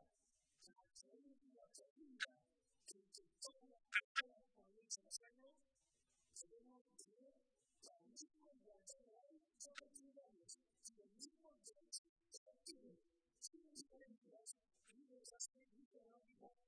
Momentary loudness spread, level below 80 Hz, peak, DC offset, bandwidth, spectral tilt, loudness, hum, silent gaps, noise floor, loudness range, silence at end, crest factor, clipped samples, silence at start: 17 LU; under -90 dBFS; -24 dBFS; under 0.1%; 11 kHz; 1 dB/octave; -54 LUFS; none; 1.90-1.96 s, 4.04-4.15 s, 6.81-6.85 s, 11.98-12.16 s, 12.37-12.46 s, 15.85-15.91 s; -87 dBFS; 14 LU; 0.15 s; 34 dB; under 0.1%; 0 s